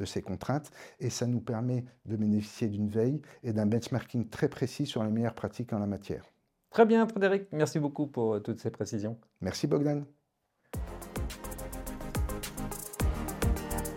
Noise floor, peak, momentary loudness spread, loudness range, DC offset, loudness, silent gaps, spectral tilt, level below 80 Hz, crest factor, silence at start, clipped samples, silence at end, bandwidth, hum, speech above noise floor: -77 dBFS; -10 dBFS; 12 LU; 6 LU; under 0.1%; -32 LUFS; none; -6.5 dB/octave; -44 dBFS; 22 dB; 0 s; under 0.1%; 0 s; 16.5 kHz; none; 46 dB